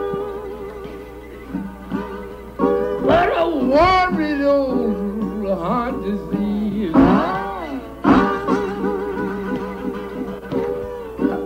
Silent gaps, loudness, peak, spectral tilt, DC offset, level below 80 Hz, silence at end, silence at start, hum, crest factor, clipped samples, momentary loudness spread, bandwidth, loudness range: none; -20 LUFS; -4 dBFS; -7.5 dB/octave; under 0.1%; -38 dBFS; 0 s; 0 s; none; 16 dB; under 0.1%; 16 LU; 16 kHz; 4 LU